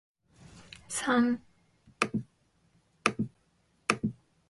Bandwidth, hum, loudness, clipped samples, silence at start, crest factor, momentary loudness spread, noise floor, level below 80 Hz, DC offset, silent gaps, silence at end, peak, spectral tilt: 11.5 kHz; none; -32 LUFS; under 0.1%; 0.55 s; 28 dB; 12 LU; -70 dBFS; -66 dBFS; under 0.1%; none; 0.4 s; -6 dBFS; -4 dB/octave